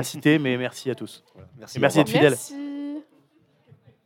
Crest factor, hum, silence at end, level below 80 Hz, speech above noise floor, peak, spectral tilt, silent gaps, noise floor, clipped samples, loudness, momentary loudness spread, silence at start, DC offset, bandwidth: 22 dB; none; 1.05 s; -74 dBFS; 39 dB; -2 dBFS; -5 dB/octave; none; -62 dBFS; under 0.1%; -22 LUFS; 17 LU; 0 s; under 0.1%; 17 kHz